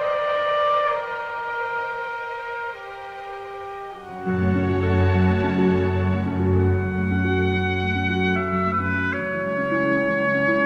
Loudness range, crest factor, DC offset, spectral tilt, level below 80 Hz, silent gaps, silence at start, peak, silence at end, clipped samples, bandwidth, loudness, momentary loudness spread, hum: 7 LU; 14 dB; under 0.1%; -8.5 dB/octave; -46 dBFS; none; 0 s; -8 dBFS; 0 s; under 0.1%; 6.4 kHz; -22 LUFS; 14 LU; none